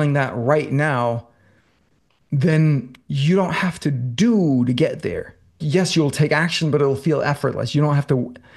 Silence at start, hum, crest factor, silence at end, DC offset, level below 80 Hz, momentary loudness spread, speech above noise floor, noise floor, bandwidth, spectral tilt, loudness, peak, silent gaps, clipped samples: 0 s; none; 18 dB; 0.2 s; under 0.1%; -54 dBFS; 7 LU; 44 dB; -63 dBFS; 12.5 kHz; -6.5 dB/octave; -19 LUFS; -2 dBFS; none; under 0.1%